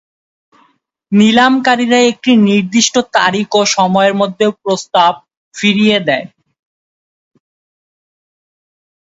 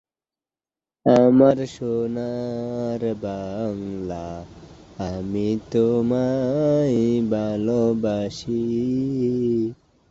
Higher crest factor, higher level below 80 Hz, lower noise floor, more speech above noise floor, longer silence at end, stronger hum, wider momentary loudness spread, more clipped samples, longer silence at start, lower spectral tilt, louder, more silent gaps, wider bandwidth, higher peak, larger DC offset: second, 14 dB vs 20 dB; second, -58 dBFS vs -52 dBFS; second, -56 dBFS vs under -90 dBFS; second, 45 dB vs over 69 dB; first, 2.75 s vs 0.35 s; neither; second, 6 LU vs 13 LU; neither; about the same, 1.1 s vs 1.05 s; second, -4 dB/octave vs -8 dB/octave; first, -11 LUFS vs -22 LUFS; first, 5.37-5.51 s vs none; about the same, 8 kHz vs 7.8 kHz; first, 0 dBFS vs -4 dBFS; neither